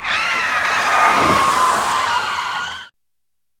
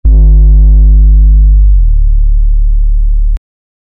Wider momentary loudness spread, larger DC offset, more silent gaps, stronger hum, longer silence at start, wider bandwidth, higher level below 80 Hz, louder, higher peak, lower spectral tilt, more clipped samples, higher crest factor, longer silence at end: first, 10 LU vs 7 LU; neither; neither; neither; about the same, 0 s vs 0.05 s; first, 18 kHz vs 0.7 kHz; second, -50 dBFS vs -4 dBFS; second, -16 LUFS vs -9 LUFS; about the same, -2 dBFS vs 0 dBFS; second, -2 dB/octave vs -13 dB/octave; neither; first, 16 dB vs 4 dB; about the same, 0.7 s vs 0.65 s